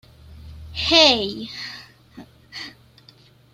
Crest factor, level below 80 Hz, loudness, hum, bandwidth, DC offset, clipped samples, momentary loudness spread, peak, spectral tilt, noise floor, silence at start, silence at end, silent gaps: 24 dB; -48 dBFS; -17 LUFS; none; 15 kHz; under 0.1%; under 0.1%; 25 LU; 0 dBFS; -2.5 dB/octave; -52 dBFS; 0.3 s; 0.85 s; none